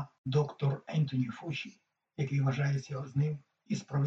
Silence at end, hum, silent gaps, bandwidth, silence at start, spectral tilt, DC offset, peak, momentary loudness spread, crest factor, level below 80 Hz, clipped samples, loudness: 0 s; none; 0.18-0.24 s; 7.6 kHz; 0 s; -7.5 dB/octave; under 0.1%; -16 dBFS; 9 LU; 16 dB; -70 dBFS; under 0.1%; -34 LUFS